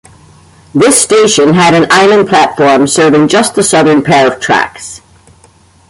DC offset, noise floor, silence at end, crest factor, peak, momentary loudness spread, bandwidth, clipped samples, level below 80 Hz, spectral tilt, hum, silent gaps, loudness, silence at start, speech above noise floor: under 0.1%; -43 dBFS; 0.95 s; 8 dB; 0 dBFS; 5 LU; 16 kHz; 0.1%; -46 dBFS; -3.5 dB/octave; none; none; -7 LUFS; 0.75 s; 36 dB